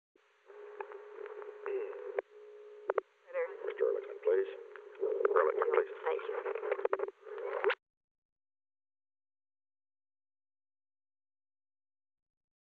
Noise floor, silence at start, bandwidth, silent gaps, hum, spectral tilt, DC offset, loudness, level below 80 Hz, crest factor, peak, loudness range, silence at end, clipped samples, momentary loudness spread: -55 dBFS; 0.5 s; 4.6 kHz; none; none; 0.5 dB/octave; under 0.1%; -36 LUFS; under -90 dBFS; 26 dB; -14 dBFS; 9 LU; 4.85 s; under 0.1%; 17 LU